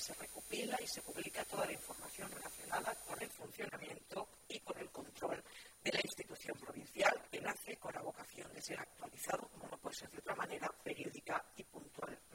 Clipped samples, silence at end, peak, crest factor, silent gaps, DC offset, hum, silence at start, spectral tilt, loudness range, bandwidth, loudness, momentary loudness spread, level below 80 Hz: under 0.1%; 0 s; -18 dBFS; 28 dB; none; under 0.1%; none; 0 s; -2.5 dB/octave; 5 LU; 16.5 kHz; -44 LUFS; 10 LU; -74 dBFS